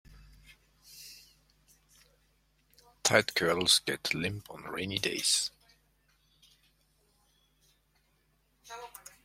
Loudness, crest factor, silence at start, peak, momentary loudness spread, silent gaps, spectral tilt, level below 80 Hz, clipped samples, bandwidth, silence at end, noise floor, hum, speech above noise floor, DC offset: -29 LUFS; 30 dB; 0.1 s; -6 dBFS; 23 LU; none; -2 dB/octave; -66 dBFS; under 0.1%; 16.5 kHz; 0.35 s; -72 dBFS; none; 41 dB; under 0.1%